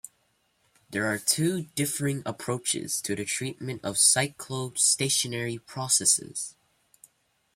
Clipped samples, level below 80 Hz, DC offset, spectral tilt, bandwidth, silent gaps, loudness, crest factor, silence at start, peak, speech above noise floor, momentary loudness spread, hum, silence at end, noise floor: under 0.1%; -68 dBFS; under 0.1%; -2.5 dB/octave; 16.5 kHz; none; -26 LUFS; 22 dB; 0.05 s; -8 dBFS; 43 dB; 13 LU; none; 1.05 s; -71 dBFS